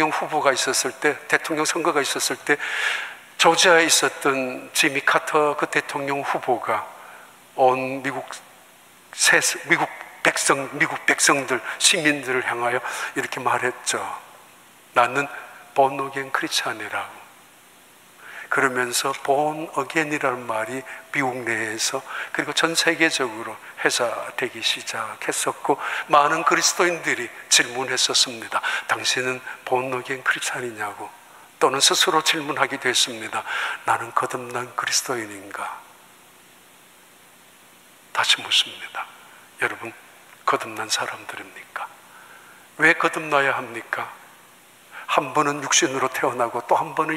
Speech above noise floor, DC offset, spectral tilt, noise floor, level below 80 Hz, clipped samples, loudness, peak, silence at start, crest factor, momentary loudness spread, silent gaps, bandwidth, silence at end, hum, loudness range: 28 dB; under 0.1%; -1.5 dB/octave; -51 dBFS; -74 dBFS; under 0.1%; -21 LUFS; -2 dBFS; 0 s; 22 dB; 14 LU; none; 16 kHz; 0 s; none; 7 LU